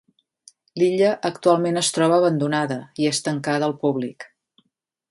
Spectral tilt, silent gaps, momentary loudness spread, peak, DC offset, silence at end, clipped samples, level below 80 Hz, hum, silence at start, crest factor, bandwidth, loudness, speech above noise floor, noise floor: -4.5 dB/octave; none; 10 LU; -4 dBFS; under 0.1%; 0.85 s; under 0.1%; -70 dBFS; none; 0.75 s; 18 dB; 11.5 kHz; -21 LUFS; 54 dB; -74 dBFS